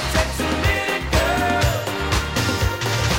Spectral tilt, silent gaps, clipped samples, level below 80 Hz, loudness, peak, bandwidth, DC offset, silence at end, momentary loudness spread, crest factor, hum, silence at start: -4 dB/octave; none; under 0.1%; -28 dBFS; -20 LUFS; -6 dBFS; 16 kHz; under 0.1%; 0 s; 3 LU; 14 dB; none; 0 s